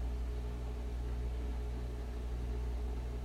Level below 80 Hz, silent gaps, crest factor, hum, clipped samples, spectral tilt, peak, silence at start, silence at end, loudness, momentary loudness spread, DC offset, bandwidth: -38 dBFS; none; 8 dB; 60 Hz at -40 dBFS; under 0.1%; -7 dB/octave; -30 dBFS; 0 s; 0 s; -41 LUFS; 2 LU; under 0.1%; 9.6 kHz